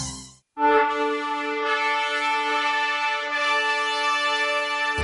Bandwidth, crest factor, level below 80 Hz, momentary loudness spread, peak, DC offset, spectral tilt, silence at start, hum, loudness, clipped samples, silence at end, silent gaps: 11.5 kHz; 18 dB; -56 dBFS; 5 LU; -6 dBFS; under 0.1%; -2 dB/octave; 0 s; none; -22 LUFS; under 0.1%; 0 s; none